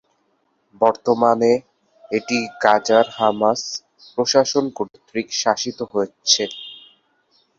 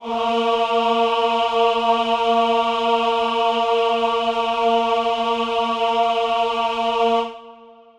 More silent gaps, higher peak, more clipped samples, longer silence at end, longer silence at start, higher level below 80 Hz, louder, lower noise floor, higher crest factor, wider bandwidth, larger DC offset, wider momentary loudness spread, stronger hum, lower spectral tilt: neither; first, 0 dBFS vs -6 dBFS; neither; first, 0.8 s vs 0.25 s; first, 0.8 s vs 0 s; second, -66 dBFS vs -56 dBFS; about the same, -19 LUFS vs -19 LUFS; first, -66 dBFS vs -44 dBFS; first, 20 dB vs 14 dB; second, 7.8 kHz vs 11 kHz; neither; first, 12 LU vs 3 LU; neither; about the same, -2.5 dB/octave vs -3.5 dB/octave